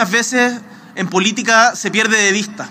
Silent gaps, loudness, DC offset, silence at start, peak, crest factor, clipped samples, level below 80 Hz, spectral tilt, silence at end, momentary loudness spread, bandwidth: none; -14 LUFS; under 0.1%; 0 s; 0 dBFS; 16 dB; under 0.1%; -68 dBFS; -2.5 dB/octave; 0 s; 11 LU; 16 kHz